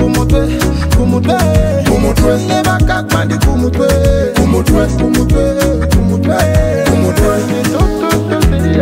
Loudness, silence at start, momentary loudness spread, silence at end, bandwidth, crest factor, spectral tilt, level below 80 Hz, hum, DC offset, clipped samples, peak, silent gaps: -12 LUFS; 0 s; 2 LU; 0 s; 16.5 kHz; 10 dB; -6 dB/octave; -16 dBFS; none; 0.8%; under 0.1%; 0 dBFS; none